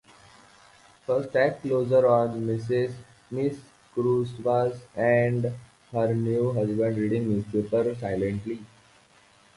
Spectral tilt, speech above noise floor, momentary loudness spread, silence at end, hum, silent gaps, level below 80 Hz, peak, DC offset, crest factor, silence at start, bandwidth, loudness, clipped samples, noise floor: -8.5 dB/octave; 33 dB; 12 LU; 0.9 s; none; none; -58 dBFS; -8 dBFS; under 0.1%; 18 dB; 1.1 s; 11.5 kHz; -26 LUFS; under 0.1%; -58 dBFS